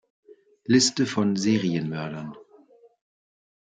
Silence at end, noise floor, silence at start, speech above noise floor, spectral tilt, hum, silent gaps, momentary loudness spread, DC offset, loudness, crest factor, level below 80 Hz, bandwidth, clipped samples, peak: 1.35 s; -55 dBFS; 0.3 s; 32 dB; -4.5 dB/octave; none; none; 18 LU; under 0.1%; -23 LUFS; 20 dB; -68 dBFS; 9.6 kHz; under 0.1%; -8 dBFS